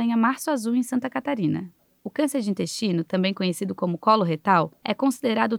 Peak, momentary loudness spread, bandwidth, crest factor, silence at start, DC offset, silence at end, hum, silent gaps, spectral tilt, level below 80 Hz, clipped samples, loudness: -6 dBFS; 7 LU; 16.5 kHz; 18 dB; 0 s; under 0.1%; 0 s; none; none; -5.5 dB/octave; -74 dBFS; under 0.1%; -24 LUFS